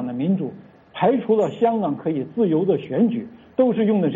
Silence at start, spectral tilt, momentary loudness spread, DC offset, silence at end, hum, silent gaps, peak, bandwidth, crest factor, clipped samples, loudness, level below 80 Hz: 0 s; -9.5 dB/octave; 8 LU; under 0.1%; 0 s; none; none; -6 dBFS; 7.4 kHz; 14 dB; under 0.1%; -21 LUFS; -64 dBFS